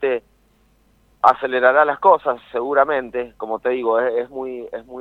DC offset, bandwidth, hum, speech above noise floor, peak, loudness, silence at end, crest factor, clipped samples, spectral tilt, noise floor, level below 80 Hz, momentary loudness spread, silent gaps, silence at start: under 0.1%; 6.2 kHz; none; 40 dB; 0 dBFS; -19 LUFS; 0 s; 20 dB; under 0.1%; -6 dB/octave; -58 dBFS; -58 dBFS; 14 LU; none; 0 s